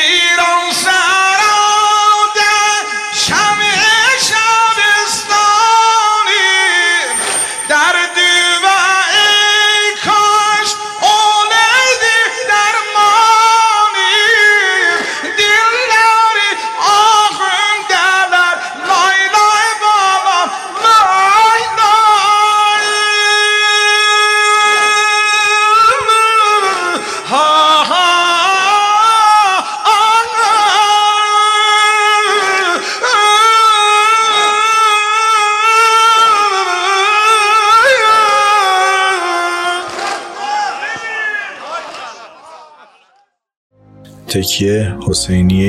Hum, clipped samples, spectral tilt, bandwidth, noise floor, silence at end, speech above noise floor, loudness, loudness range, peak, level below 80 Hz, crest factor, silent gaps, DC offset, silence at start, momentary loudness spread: none; under 0.1%; -1 dB/octave; 15 kHz; -55 dBFS; 0 s; 43 dB; -9 LUFS; 5 LU; 0 dBFS; -48 dBFS; 10 dB; 43.57-43.70 s; under 0.1%; 0 s; 7 LU